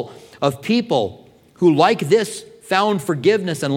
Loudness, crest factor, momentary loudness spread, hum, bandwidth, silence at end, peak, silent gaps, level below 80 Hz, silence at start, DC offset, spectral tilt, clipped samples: -18 LUFS; 18 dB; 12 LU; none; 16.5 kHz; 0 s; -2 dBFS; none; -64 dBFS; 0 s; under 0.1%; -5.5 dB/octave; under 0.1%